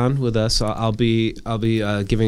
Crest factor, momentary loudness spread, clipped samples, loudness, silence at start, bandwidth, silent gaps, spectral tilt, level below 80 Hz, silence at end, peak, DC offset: 14 dB; 3 LU; under 0.1%; -20 LUFS; 0 s; 12.5 kHz; none; -6 dB/octave; -34 dBFS; 0 s; -4 dBFS; under 0.1%